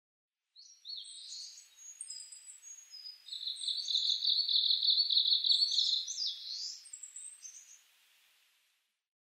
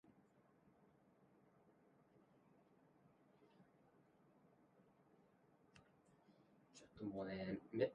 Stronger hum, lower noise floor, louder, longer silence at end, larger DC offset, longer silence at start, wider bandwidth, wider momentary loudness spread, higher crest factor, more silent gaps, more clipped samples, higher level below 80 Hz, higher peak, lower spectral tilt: neither; about the same, -78 dBFS vs -75 dBFS; first, -29 LUFS vs -48 LUFS; first, 1.5 s vs 0 s; neither; first, 0.55 s vs 0.1 s; first, 16 kHz vs 5.4 kHz; about the same, 23 LU vs 21 LU; second, 20 dB vs 26 dB; neither; neither; second, under -90 dBFS vs -82 dBFS; first, -16 dBFS vs -28 dBFS; second, 8.5 dB/octave vs -6 dB/octave